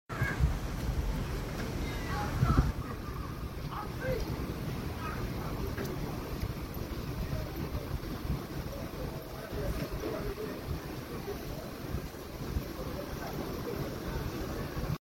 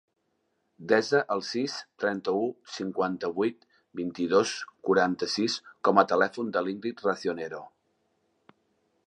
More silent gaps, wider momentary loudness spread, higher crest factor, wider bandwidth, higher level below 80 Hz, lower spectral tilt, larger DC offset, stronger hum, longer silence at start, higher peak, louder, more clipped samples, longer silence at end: neither; second, 7 LU vs 12 LU; about the same, 24 dB vs 24 dB; first, 17 kHz vs 11 kHz; first, -40 dBFS vs -72 dBFS; first, -6 dB/octave vs -4.5 dB/octave; neither; neither; second, 0.1 s vs 0.8 s; second, -12 dBFS vs -6 dBFS; second, -37 LUFS vs -28 LUFS; neither; second, 0.1 s vs 1.4 s